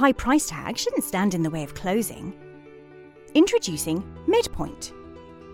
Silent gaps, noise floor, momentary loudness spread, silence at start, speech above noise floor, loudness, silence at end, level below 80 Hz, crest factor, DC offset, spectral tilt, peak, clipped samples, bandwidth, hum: none; -46 dBFS; 20 LU; 0 s; 23 dB; -24 LUFS; 0 s; -46 dBFS; 20 dB; under 0.1%; -4.5 dB/octave; -4 dBFS; under 0.1%; 17 kHz; none